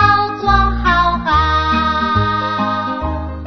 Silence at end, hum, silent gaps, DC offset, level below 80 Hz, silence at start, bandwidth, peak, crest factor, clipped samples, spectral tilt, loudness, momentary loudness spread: 0 s; none; none; 0.8%; -24 dBFS; 0 s; 6.4 kHz; 0 dBFS; 14 dB; under 0.1%; -6.5 dB/octave; -15 LUFS; 6 LU